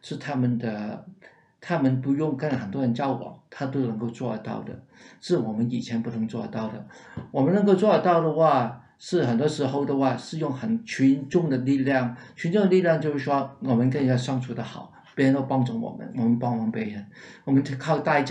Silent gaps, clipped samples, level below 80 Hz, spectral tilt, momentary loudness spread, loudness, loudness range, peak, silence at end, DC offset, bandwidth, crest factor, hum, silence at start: none; under 0.1%; -70 dBFS; -7.5 dB/octave; 15 LU; -25 LUFS; 6 LU; -8 dBFS; 0 s; under 0.1%; 10 kHz; 18 dB; none; 0.05 s